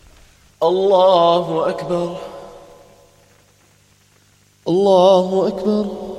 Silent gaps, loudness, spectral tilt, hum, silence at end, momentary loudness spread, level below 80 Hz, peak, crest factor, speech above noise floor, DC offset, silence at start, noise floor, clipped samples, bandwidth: none; -16 LUFS; -6.5 dB/octave; 50 Hz at -55 dBFS; 0 s; 16 LU; -54 dBFS; 0 dBFS; 18 dB; 39 dB; under 0.1%; 0.6 s; -54 dBFS; under 0.1%; 11.5 kHz